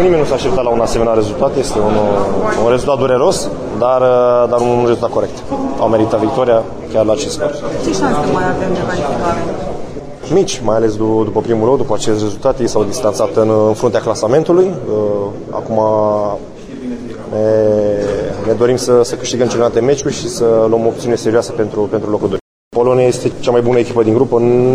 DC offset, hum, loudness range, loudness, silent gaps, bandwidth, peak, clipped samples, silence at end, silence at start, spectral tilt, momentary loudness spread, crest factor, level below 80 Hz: under 0.1%; none; 3 LU; -14 LUFS; 22.41-22.71 s; 14 kHz; 0 dBFS; under 0.1%; 0 s; 0 s; -6 dB/octave; 8 LU; 12 dB; -36 dBFS